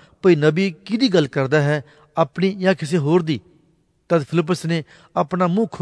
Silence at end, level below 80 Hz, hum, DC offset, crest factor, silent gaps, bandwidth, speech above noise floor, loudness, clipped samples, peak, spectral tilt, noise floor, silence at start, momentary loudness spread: 0 s; -62 dBFS; none; under 0.1%; 18 dB; none; 11 kHz; 42 dB; -20 LUFS; under 0.1%; -2 dBFS; -7 dB/octave; -60 dBFS; 0.25 s; 8 LU